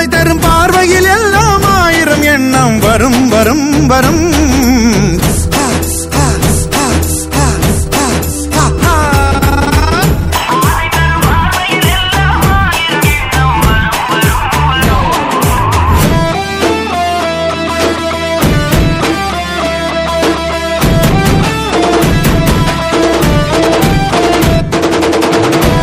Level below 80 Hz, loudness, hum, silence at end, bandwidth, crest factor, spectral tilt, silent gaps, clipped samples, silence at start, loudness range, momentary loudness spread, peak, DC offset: -20 dBFS; -10 LUFS; none; 0 s; 16.5 kHz; 10 dB; -4.5 dB/octave; none; 0.4%; 0 s; 3 LU; 5 LU; 0 dBFS; under 0.1%